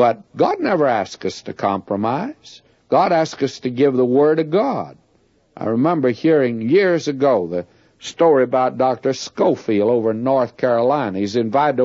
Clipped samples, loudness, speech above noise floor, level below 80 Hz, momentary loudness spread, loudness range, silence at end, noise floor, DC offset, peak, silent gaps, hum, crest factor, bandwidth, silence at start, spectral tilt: under 0.1%; -18 LUFS; 41 dB; -64 dBFS; 10 LU; 3 LU; 0 s; -58 dBFS; under 0.1%; -2 dBFS; none; none; 14 dB; 7.8 kHz; 0 s; -6.5 dB/octave